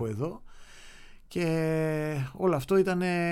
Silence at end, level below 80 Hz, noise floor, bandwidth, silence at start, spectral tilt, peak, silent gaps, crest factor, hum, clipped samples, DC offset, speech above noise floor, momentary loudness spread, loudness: 0 s; -54 dBFS; -48 dBFS; 16.5 kHz; 0 s; -7 dB/octave; -12 dBFS; none; 16 dB; none; under 0.1%; under 0.1%; 20 dB; 11 LU; -29 LUFS